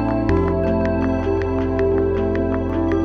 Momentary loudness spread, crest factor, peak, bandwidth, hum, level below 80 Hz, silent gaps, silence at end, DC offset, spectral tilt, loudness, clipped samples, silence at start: 2 LU; 12 dB; -6 dBFS; 6.4 kHz; none; -30 dBFS; none; 0 s; under 0.1%; -9.5 dB/octave; -20 LUFS; under 0.1%; 0 s